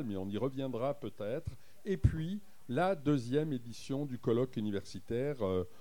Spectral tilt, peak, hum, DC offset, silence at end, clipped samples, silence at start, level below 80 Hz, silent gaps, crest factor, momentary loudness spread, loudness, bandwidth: -7.5 dB/octave; -14 dBFS; none; 0.4%; 0.1 s; under 0.1%; 0 s; -50 dBFS; none; 22 dB; 9 LU; -36 LUFS; 19 kHz